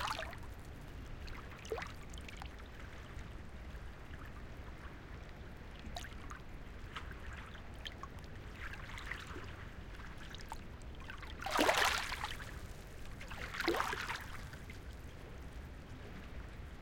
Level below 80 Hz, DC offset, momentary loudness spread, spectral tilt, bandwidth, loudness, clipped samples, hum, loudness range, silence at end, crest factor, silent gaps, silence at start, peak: -52 dBFS; under 0.1%; 14 LU; -3.5 dB/octave; 17 kHz; -44 LUFS; under 0.1%; none; 13 LU; 0 s; 28 dB; none; 0 s; -16 dBFS